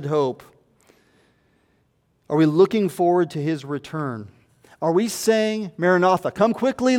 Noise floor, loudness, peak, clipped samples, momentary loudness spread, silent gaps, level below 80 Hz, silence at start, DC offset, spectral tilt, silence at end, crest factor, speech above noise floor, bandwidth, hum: -65 dBFS; -21 LUFS; -6 dBFS; under 0.1%; 11 LU; none; -64 dBFS; 0 s; under 0.1%; -6 dB/octave; 0 s; 16 dB; 45 dB; 17 kHz; none